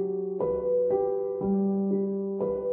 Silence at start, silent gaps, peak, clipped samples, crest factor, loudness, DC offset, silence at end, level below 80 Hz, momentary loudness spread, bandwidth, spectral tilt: 0 s; none; -16 dBFS; under 0.1%; 12 dB; -28 LUFS; under 0.1%; 0 s; -58 dBFS; 4 LU; 2.1 kHz; -14 dB/octave